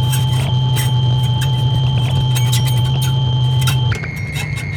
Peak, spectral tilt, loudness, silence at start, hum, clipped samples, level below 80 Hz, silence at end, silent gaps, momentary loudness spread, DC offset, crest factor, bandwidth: -4 dBFS; -5 dB/octave; -16 LUFS; 0 s; none; under 0.1%; -34 dBFS; 0 s; none; 6 LU; under 0.1%; 12 dB; 19.5 kHz